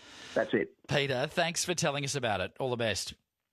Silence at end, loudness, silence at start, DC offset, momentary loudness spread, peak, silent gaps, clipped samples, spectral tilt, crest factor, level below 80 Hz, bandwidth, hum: 0.4 s; -31 LUFS; 0 s; under 0.1%; 5 LU; -14 dBFS; none; under 0.1%; -3.5 dB/octave; 20 dB; -60 dBFS; 14 kHz; none